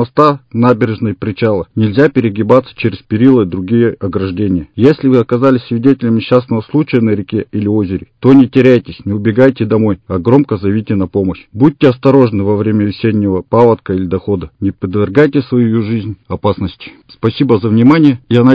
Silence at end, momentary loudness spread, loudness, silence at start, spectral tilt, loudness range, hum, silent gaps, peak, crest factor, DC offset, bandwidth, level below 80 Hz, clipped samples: 0 s; 9 LU; -12 LUFS; 0 s; -9.5 dB/octave; 2 LU; none; none; 0 dBFS; 10 dB; under 0.1%; 6.2 kHz; -38 dBFS; 1%